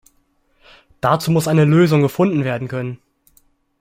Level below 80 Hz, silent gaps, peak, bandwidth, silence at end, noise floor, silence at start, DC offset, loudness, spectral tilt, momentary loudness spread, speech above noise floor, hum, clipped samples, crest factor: -54 dBFS; none; -2 dBFS; 16 kHz; 0.85 s; -61 dBFS; 1.05 s; under 0.1%; -16 LUFS; -7 dB/octave; 13 LU; 46 dB; none; under 0.1%; 16 dB